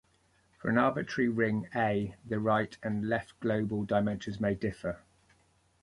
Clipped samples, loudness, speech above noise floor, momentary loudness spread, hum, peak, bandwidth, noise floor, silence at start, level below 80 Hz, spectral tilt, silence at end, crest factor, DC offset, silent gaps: under 0.1%; -31 LUFS; 38 dB; 7 LU; none; -14 dBFS; 11 kHz; -69 dBFS; 0.65 s; -60 dBFS; -7.5 dB/octave; 0.85 s; 18 dB; under 0.1%; none